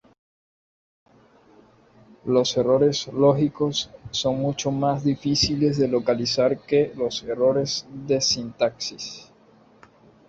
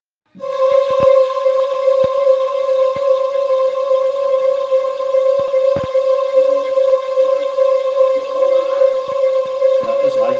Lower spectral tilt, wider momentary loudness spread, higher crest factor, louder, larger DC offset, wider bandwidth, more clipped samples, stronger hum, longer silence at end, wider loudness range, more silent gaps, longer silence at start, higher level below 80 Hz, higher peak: about the same, -5 dB/octave vs -5 dB/octave; first, 9 LU vs 3 LU; first, 18 dB vs 12 dB; second, -22 LUFS vs -15 LUFS; neither; about the same, 8 kHz vs 7.4 kHz; neither; neither; first, 1.05 s vs 0 s; about the same, 3 LU vs 1 LU; neither; first, 2.25 s vs 0.35 s; about the same, -54 dBFS vs -58 dBFS; second, -6 dBFS vs -2 dBFS